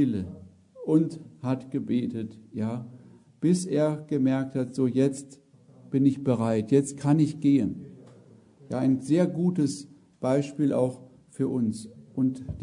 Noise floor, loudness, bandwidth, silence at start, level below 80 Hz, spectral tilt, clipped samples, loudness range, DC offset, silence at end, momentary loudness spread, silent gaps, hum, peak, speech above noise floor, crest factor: -54 dBFS; -27 LUFS; 11 kHz; 0 s; -62 dBFS; -7.5 dB/octave; under 0.1%; 3 LU; under 0.1%; 0 s; 15 LU; none; none; -10 dBFS; 28 dB; 18 dB